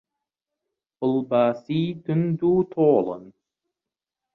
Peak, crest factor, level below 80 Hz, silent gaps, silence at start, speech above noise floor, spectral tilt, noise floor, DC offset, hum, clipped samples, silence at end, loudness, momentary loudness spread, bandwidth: -6 dBFS; 18 dB; -64 dBFS; none; 1 s; 67 dB; -10.5 dB/octave; -89 dBFS; under 0.1%; none; under 0.1%; 1.05 s; -23 LUFS; 8 LU; 6 kHz